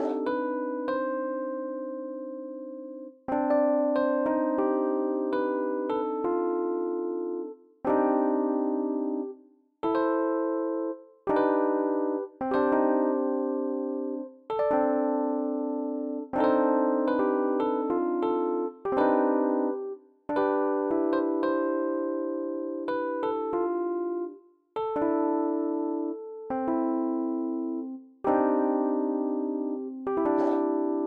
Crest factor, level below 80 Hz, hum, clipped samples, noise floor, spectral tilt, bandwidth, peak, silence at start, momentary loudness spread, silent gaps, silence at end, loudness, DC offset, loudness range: 16 dB; -68 dBFS; none; under 0.1%; -56 dBFS; -8.5 dB/octave; 4.8 kHz; -12 dBFS; 0 s; 10 LU; none; 0 s; -28 LUFS; under 0.1%; 3 LU